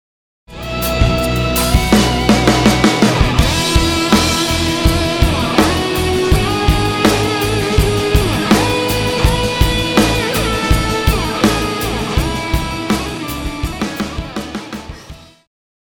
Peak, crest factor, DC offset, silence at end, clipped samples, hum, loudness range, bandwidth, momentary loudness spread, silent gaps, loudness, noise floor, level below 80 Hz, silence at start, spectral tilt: 0 dBFS; 14 dB; under 0.1%; 0.7 s; under 0.1%; none; 7 LU; over 20 kHz; 10 LU; none; -14 LUFS; -36 dBFS; -22 dBFS; 0.5 s; -4.5 dB/octave